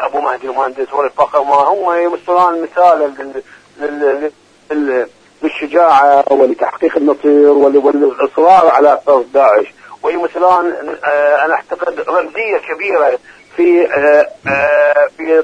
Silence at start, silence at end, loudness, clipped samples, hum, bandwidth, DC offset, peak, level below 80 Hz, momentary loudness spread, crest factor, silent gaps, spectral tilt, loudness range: 0 s; 0 s; -12 LUFS; 0.1%; none; 9.6 kHz; under 0.1%; 0 dBFS; -56 dBFS; 11 LU; 12 dB; none; -5.5 dB/octave; 5 LU